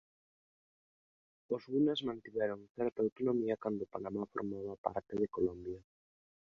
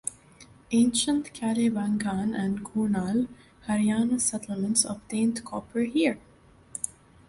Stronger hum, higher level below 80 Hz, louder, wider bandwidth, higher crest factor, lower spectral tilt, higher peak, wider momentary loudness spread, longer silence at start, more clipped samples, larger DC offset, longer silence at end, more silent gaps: neither; second, -70 dBFS vs -58 dBFS; second, -37 LUFS vs -27 LUFS; second, 7.2 kHz vs 11.5 kHz; about the same, 22 dB vs 20 dB; about the same, -5 dB/octave vs -4 dB/octave; second, -16 dBFS vs -8 dBFS; about the same, 9 LU vs 10 LU; first, 1.5 s vs 0.05 s; neither; neither; first, 0.75 s vs 0.4 s; first, 2.70-2.75 s, 3.12-3.16 s, 4.78-4.84 s vs none